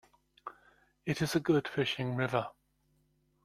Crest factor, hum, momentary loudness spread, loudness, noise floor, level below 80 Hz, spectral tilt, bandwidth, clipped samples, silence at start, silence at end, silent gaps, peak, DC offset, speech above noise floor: 20 dB; none; 20 LU; -33 LUFS; -73 dBFS; -66 dBFS; -5.5 dB/octave; 15 kHz; under 0.1%; 0.45 s; 0.95 s; none; -16 dBFS; under 0.1%; 42 dB